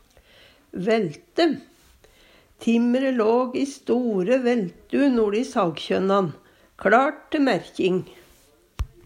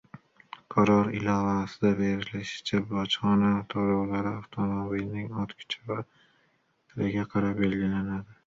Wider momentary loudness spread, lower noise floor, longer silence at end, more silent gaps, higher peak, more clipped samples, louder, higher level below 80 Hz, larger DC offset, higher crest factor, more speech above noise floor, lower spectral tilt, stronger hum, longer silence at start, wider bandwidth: about the same, 10 LU vs 11 LU; second, -57 dBFS vs -69 dBFS; about the same, 0.2 s vs 0.15 s; neither; first, -4 dBFS vs -10 dBFS; neither; first, -22 LUFS vs -28 LUFS; first, -48 dBFS vs -54 dBFS; neither; about the same, 20 dB vs 18 dB; second, 35 dB vs 42 dB; about the same, -6 dB/octave vs -7 dB/octave; neither; first, 0.75 s vs 0.15 s; first, 12 kHz vs 7.6 kHz